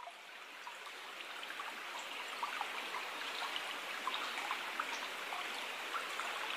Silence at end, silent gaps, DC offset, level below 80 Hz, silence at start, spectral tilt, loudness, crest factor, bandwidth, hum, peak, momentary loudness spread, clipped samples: 0 s; none; under 0.1%; under -90 dBFS; 0 s; 0.5 dB/octave; -41 LUFS; 20 dB; 15.5 kHz; none; -24 dBFS; 8 LU; under 0.1%